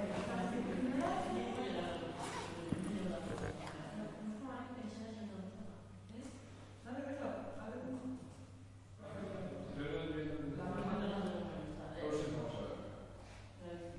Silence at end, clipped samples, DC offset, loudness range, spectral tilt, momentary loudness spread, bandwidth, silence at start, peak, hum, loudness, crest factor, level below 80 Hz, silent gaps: 0 s; under 0.1%; under 0.1%; 7 LU; -6 dB/octave; 14 LU; 11.5 kHz; 0 s; -24 dBFS; none; -43 LUFS; 20 dB; -62 dBFS; none